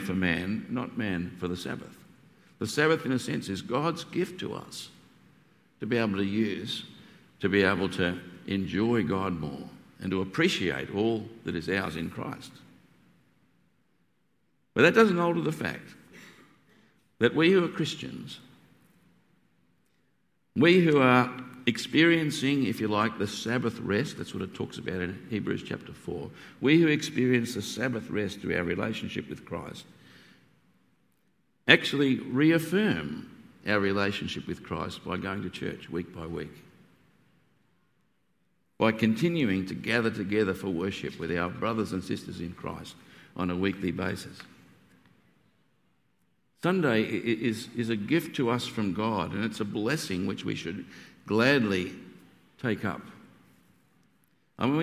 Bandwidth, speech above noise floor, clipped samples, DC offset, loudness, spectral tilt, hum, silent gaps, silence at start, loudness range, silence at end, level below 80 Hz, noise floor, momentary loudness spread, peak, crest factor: 15.5 kHz; 46 dB; under 0.1%; under 0.1%; -28 LUFS; -5.5 dB/octave; none; none; 0 s; 9 LU; 0 s; -56 dBFS; -74 dBFS; 16 LU; 0 dBFS; 28 dB